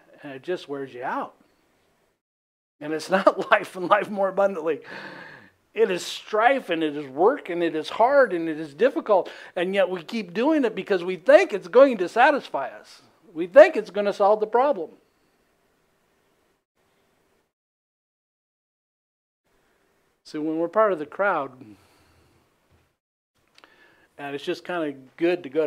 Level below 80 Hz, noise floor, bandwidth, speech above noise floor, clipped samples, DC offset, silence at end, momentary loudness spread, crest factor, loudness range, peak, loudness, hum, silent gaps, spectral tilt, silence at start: -78 dBFS; -67 dBFS; 13.5 kHz; 45 dB; under 0.1%; under 0.1%; 0 s; 17 LU; 24 dB; 13 LU; 0 dBFS; -22 LUFS; none; 2.21-2.79 s, 16.65-16.75 s, 17.53-19.44 s, 23.00-23.34 s; -5 dB/octave; 0.25 s